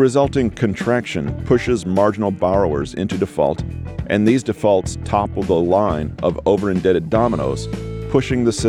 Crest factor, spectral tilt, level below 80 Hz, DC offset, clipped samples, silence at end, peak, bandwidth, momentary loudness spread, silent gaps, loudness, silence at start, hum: 14 dB; -6.5 dB/octave; -36 dBFS; under 0.1%; under 0.1%; 0 s; -4 dBFS; 13 kHz; 7 LU; none; -19 LUFS; 0 s; none